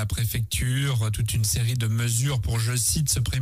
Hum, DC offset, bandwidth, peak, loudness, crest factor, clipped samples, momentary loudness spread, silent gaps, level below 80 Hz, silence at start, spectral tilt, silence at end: none; under 0.1%; 16 kHz; -10 dBFS; -24 LUFS; 14 dB; under 0.1%; 3 LU; none; -36 dBFS; 0 s; -4 dB/octave; 0 s